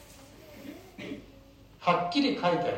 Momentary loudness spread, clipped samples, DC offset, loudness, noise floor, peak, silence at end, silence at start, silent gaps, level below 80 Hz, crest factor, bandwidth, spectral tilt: 24 LU; under 0.1%; under 0.1%; -28 LUFS; -54 dBFS; -12 dBFS; 0 s; 0 s; none; -60 dBFS; 20 dB; 16 kHz; -5.5 dB/octave